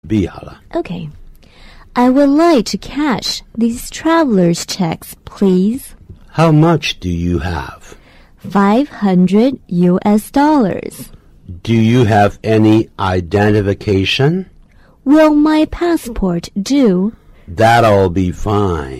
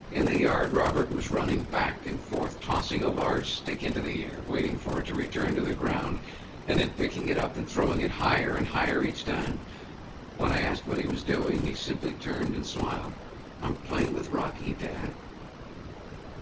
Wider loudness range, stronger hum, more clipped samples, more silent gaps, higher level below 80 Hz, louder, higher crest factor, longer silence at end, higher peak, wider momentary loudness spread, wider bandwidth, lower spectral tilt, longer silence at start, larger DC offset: about the same, 3 LU vs 4 LU; neither; neither; neither; first, -36 dBFS vs -42 dBFS; first, -13 LUFS vs -30 LUFS; second, 12 dB vs 18 dB; about the same, 0 s vs 0 s; first, 0 dBFS vs -12 dBFS; second, 14 LU vs 17 LU; first, 15 kHz vs 8 kHz; about the same, -6.5 dB/octave vs -6 dB/octave; about the same, 0.05 s vs 0 s; neither